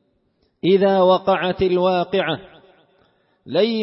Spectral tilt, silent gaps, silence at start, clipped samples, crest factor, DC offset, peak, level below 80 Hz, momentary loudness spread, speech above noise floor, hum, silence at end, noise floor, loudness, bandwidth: -10.5 dB/octave; none; 0.65 s; under 0.1%; 16 dB; under 0.1%; -4 dBFS; -54 dBFS; 9 LU; 48 dB; none; 0 s; -65 dBFS; -18 LUFS; 5.8 kHz